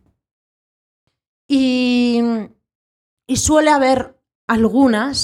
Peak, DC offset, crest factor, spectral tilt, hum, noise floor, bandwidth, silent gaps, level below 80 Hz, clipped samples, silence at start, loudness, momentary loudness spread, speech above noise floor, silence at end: -2 dBFS; under 0.1%; 16 dB; -4 dB/octave; none; under -90 dBFS; 15 kHz; 2.75-3.17 s, 4.35-4.48 s; -44 dBFS; under 0.1%; 1.5 s; -16 LUFS; 12 LU; over 76 dB; 0 s